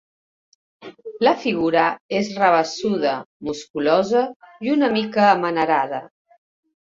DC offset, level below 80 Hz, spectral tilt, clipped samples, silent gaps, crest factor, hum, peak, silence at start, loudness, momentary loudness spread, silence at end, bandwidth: under 0.1%; -62 dBFS; -5 dB/octave; under 0.1%; 2.01-2.09 s, 3.26-3.40 s, 3.70-3.74 s, 4.36-4.40 s; 18 dB; none; -2 dBFS; 0.8 s; -20 LUFS; 12 LU; 0.85 s; 7.8 kHz